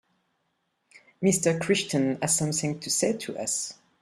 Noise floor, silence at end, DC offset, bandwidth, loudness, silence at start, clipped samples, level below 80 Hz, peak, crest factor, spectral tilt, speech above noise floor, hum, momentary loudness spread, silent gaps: -75 dBFS; 0.3 s; under 0.1%; 14.5 kHz; -26 LUFS; 1.2 s; under 0.1%; -66 dBFS; -10 dBFS; 18 dB; -3.5 dB/octave; 49 dB; none; 6 LU; none